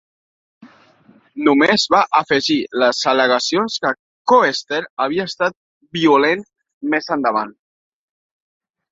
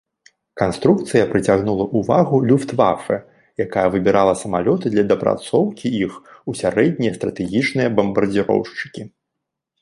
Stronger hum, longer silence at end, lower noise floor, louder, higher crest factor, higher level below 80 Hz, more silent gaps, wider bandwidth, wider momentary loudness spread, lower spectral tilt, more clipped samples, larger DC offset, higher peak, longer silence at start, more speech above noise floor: neither; first, 1.4 s vs 0.75 s; second, -52 dBFS vs -80 dBFS; about the same, -17 LUFS vs -18 LUFS; about the same, 18 dB vs 18 dB; second, -62 dBFS vs -50 dBFS; first, 3.99-4.25 s, 4.90-4.97 s, 5.57-5.81 s, 6.73-6.81 s vs none; second, 7.8 kHz vs 11.5 kHz; about the same, 10 LU vs 10 LU; second, -3.5 dB/octave vs -6.5 dB/octave; neither; neither; about the same, -2 dBFS vs 0 dBFS; about the same, 0.65 s vs 0.55 s; second, 35 dB vs 62 dB